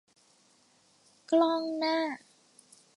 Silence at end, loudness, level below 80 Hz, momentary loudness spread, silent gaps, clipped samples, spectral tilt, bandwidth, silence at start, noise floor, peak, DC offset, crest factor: 0.8 s; -29 LUFS; -88 dBFS; 10 LU; none; under 0.1%; -3.5 dB/octave; 11.5 kHz; 1.3 s; -66 dBFS; -14 dBFS; under 0.1%; 18 dB